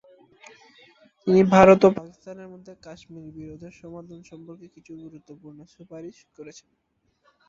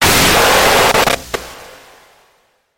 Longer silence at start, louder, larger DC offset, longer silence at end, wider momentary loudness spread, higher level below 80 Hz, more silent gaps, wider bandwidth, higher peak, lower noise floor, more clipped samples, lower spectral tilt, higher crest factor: first, 1.25 s vs 0 s; second, -17 LUFS vs -10 LUFS; neither; about the same, 1.05 s vs 1.15 s; first, 30 LU vs 16 LU; second, -56 dBFS vs -34 dBFS; neither; second, 7.6 kHz vs 17 kHz; about the same, 0 dBFS vs 0 dBFS; first, -66 dBFS vs -57 dBFS; neither; first, -7 dB/octave vs -2 dB/octave; first, 24 dB vs 14 dB